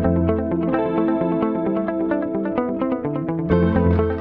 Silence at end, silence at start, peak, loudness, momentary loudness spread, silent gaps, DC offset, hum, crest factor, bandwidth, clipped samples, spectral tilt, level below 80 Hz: 0 s; 0 s; -4 dBFS; -21 LUFS; 5 LU; none; under 0.1%; none; 16 dB; 5 kHz; under 0.1%; -11.5 dB/octave; -36 dBFS